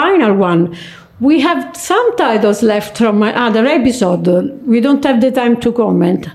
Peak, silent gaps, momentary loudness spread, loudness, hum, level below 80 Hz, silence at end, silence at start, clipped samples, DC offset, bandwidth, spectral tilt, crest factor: -2 dBFS; none; 4 LU; -12 LUFS; none; -48 dBFS; 0 s; 0 s; under 0.1%; under 0.1%; 14.5 kHz; -6 dB/octave; 10 dB